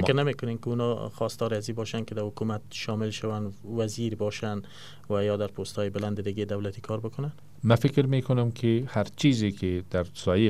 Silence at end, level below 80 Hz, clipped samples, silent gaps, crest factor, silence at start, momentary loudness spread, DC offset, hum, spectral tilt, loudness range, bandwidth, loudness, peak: 0 s; -58 dBFS; under 0.1%; none; 22 dB; 0 s; 10 LU; 0.5%; none; -6.5 dB/octave; 5 LU; 14.5 kHz; -29 LUFS; -6 dBFS